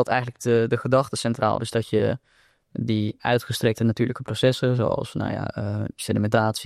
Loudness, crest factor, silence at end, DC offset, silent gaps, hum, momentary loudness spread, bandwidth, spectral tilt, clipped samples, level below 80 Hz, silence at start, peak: -24 LUFS; 16 dB; 0 s; under 0.1%; none; none; 7 LU; 14 kHz; -6 dB/octave; under 0.1%; -56 dBFS; 0 s; -8 dBFS